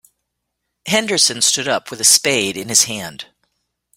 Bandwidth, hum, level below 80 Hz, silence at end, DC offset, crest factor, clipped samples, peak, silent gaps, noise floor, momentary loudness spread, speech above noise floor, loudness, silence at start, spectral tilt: 17 kHz; 60 Hz at -55 dBFS; -60 dBFS; 0.75 s; under 0.1%; 20 dB; under 0.1%; 0 dBFS; none; -76 dBFS; 17 LU; 59 dB; -14 LUFS; 0.85 s; -1 dB/octave